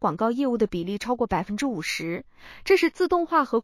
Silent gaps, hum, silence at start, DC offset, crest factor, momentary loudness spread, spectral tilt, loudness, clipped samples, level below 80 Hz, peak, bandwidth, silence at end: none; none; 0 s; under 0.1%; 16 dB; 8 LU; -5 dB/octave; -25 LUFS; under 0.1%; -52 dBFS; -8 dBFS; 15 kHz; 0 s